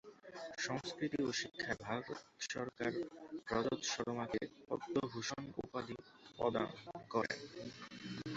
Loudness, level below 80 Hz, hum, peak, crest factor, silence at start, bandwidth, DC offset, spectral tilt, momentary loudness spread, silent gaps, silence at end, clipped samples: -42 LUFS; -70 dBFS; none; -22 dBFS; 20 dB; 0.05 s; 8 kHz; under 0.1%; -3.5 dB/octave; 12 LU; none; 0 s; under 0.1%